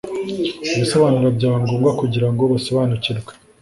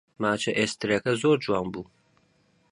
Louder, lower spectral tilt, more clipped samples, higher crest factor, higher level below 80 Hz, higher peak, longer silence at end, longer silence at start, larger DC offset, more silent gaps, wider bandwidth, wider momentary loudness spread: first, -18 LUFS vs -26 LUFS; first, -6.5 dB/octave vs -4.5 dB/octave; neither; about the same, 16 dB vs 18 dB; first, -50 dBFS vs -60 dBFS; first, -2 dBFS vs -10 dBFS; second, 0.3 s vs 0.9 s; second, 0.05 s vs 0.2 s; neither; neither; about the same, 11.5 kHz vs 11.5 kHz; second, 8 LU vs 13 LU